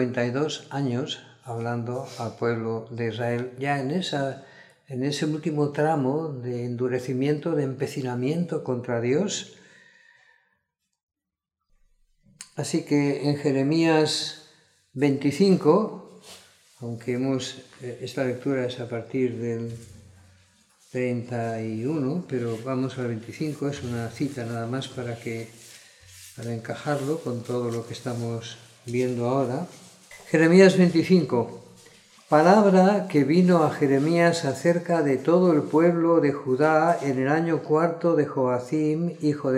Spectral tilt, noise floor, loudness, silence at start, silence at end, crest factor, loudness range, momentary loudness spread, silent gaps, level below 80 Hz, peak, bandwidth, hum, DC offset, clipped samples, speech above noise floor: -6.5 dB/octave; -85 dBFS; -24 LUFS; 0 s; 0 s; 20 dB; 11 LU; 14 LU; 11.03-11.08 s; -70 dBFS; -4 dBFS; 13.5 kHz; none; under 0.1%; under 0.1%; 61 dB